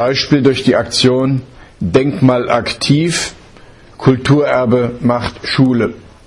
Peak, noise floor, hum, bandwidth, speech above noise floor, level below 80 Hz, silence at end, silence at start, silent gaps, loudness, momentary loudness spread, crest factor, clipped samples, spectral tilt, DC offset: 0 dBFS; -39 dBFS; none; 11.5 kHz; 27 dB; -42 dBFS; 0.25 s; 0 s; none; -13 LUFS; 6 LU; 14 dB; under 0.1%; -5.5 dB/octave; under 0.1%